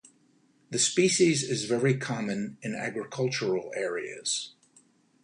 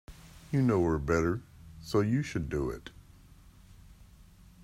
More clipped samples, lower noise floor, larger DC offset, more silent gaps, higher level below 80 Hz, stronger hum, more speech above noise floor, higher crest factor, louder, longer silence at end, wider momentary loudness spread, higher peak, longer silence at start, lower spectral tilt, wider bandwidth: neither; first, -65 dBFS vs -56 dBFS; neither; neither; second, -72 dBFS vs -48 dBFS; neither; first, 37 dB vs 27 dB; about the same, 18 dB vs 18 dB; about the same, -28 LUFS vs -30 LUFS; first, 0.75 s vs 0.4 s; second, 11 LU vs 24 LU; first, -10 dBFS vs -14 dBFS; first, 0.7 s vs 0.1 s; second, -3.5 dB/octave vs -7.5 dB/octave; second, 11 kHz vs 15.5 kHz